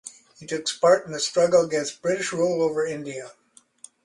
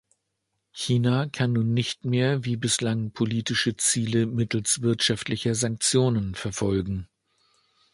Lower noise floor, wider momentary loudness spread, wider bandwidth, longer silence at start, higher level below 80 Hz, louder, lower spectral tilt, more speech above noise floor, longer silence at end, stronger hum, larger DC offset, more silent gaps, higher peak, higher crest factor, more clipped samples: second, -51 dBFS vs -78 dBFS; first, 18 LU vs 6 LU; about the same, 11.5 kHz vs 11.5 kHz; second, 0.05 s vs 0.75 s; second, -68 dBFS vs -52 dBFS; about the same, -23 LUFS vs -25 LUFS; about the same, -3.5 dB/octave vs -4.5 dB/octave; second, 28 dB vs 54 dB; second, 0.75 s vs 0.9 s; neither; neither; neither; about the same, -6 dBFS vs -8 dBFS; about the same, 18 dB vs 18 dB; neither